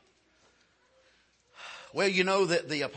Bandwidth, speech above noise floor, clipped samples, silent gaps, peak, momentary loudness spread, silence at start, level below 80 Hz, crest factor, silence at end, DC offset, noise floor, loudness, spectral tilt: 8.8 kHz; 39 dB; under 0.1%; none; -14 dBFS; 20 LU; 1.6 s; -78 dBFS; 20 dB; 0 s; under 0.1%; -67 dBFS; -27 LUFS; -4 dB/octave